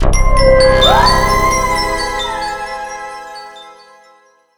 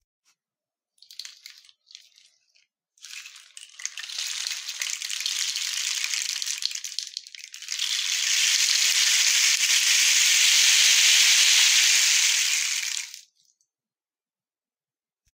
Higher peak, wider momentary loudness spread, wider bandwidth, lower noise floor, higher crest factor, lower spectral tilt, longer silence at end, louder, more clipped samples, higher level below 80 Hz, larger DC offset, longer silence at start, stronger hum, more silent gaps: about the same, 0 dBFS vs -2 dBFS; about the same, 20 LU vs 21 LU; first, over 20 kHz vs 16.5 kHz; second, -49 dBFS vs under -90 dBFS; second, 12 dB vs 22 dB; first, -3.5 dB/octave vs 10 dB/octave; second, 0.85 s vs 2.2 s; first, -12 LUFS vs -19 LUFS; neither; first, -18 dBFS vs under -90 dBFS; neither; second, 0 s vs 1.2 s; neither; neither